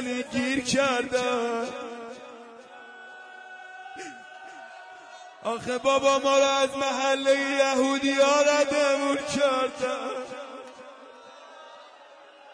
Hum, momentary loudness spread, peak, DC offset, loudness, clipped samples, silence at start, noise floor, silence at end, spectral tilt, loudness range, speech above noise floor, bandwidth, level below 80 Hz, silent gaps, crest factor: none; 24 LU; -10 dBFS; under 0.1%; -24 LUFS; under 0.1%; 0 s; -50 dBFS; 0 s; -2.5 dB/octave; 17 LU; 26 dB; 10.5 kHz; -66 dBFS; none; 16 dB